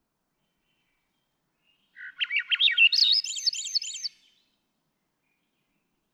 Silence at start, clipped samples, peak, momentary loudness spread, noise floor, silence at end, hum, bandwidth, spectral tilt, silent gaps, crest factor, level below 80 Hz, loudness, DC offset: 2 s; under 0.1%; -10 dBFS; 15 LU; -78 dBFS; 2.05 s; none; 13.5 kHz; 7 dB/octave; none; 20 dB; -88 dBFS; -22 LUFS; under 0.1%